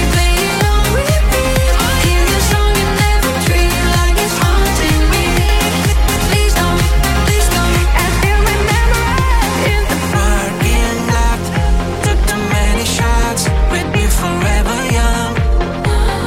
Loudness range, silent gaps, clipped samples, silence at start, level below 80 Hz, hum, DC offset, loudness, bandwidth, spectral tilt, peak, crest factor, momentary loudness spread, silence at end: 2 LU; none; under 0.1%; 0 s; -14 dBFS; none; under 0.1%; -14 LUFS; 16.5 kHz; -4.5 dB/octave; -2 dBFS; 10 dB; 3 LU; 0 s